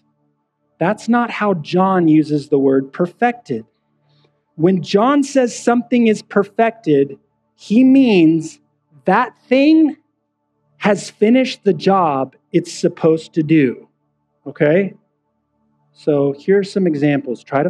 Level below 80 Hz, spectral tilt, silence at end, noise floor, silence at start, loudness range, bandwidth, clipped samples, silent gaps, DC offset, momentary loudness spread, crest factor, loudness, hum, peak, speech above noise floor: -70 dBFS; -6.5 dB/octave; 0 s; -69 dBFS; 0.8 s; 4 LU; 10.5 kHz; under 0.1%; none; under 0.1%; 9 LU; 16 dB; -16 LUFS; none; 0 dBFS; 55 dB